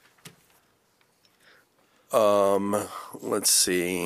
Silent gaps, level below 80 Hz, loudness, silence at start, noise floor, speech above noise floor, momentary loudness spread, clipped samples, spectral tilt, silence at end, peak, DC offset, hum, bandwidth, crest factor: none; -68 dBFS; -23 LUFS; 0.25 s; -66 dBFS; 42 dB; 12 LU; under 0.1%; -2.5 dB/octave; 0 s; -6 dBFS; under 0.1%; none; 15 kHz; 20 dB